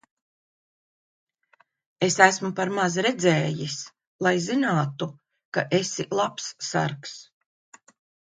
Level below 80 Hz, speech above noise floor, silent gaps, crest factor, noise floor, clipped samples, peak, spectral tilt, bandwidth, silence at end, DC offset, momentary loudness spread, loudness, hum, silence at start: -70 dBFS; 40 dB; 4.07-4.19 s, 5.45-5.52 s; 26 dB; -64 dBFS; under 0.1%; 0 dBFS; -4 dB/octave; 9.6 kHz; 1.05 s; under 0.1%; 16 LU; -24 LUFS; none; 2 s